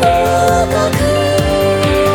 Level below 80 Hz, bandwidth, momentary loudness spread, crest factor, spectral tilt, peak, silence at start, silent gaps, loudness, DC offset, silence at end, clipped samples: -26 dBFS; over 20 kHz; 2 LU; 12 dB; -5 dB/octave; 0 dBFS; 0 s; none; -13 LUFS; under 0.1%; 0 s; under 0.1%